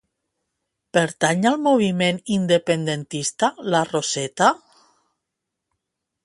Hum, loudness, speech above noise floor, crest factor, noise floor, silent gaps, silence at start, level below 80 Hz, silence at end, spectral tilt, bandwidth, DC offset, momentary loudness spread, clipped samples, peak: none; -21 LUFS; 61 dB; 20 dB; -81 dBFS; none; 0.95 s; -64 dBFS; 1.7 s; -4.5 dB/octave; 11.5 kHz; under 0.1%; 6 LU; under 0.1%; -2 dBFS